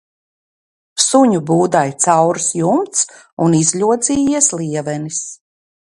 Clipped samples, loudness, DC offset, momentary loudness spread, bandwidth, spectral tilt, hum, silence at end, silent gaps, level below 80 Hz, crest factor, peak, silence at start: under 0.1%; -15 LUFS; under 0.1%; 9 LU; 11.5 kHz; -4 dB/octave; none; 0.6 s; 3.33-3.37 s; -54 dBFS; 16 dB; 0 dBFS; 0.95 s